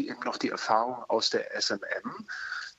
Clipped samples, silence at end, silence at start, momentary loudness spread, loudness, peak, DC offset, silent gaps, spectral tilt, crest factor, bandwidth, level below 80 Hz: under 0.1%; 0.1 s; 0 s; 9 LU; -30 LUFS; -10 dBFS; under 0.1%; none; -2 dB/octave; 22 dB; 8.4 kHz; -78 dBFS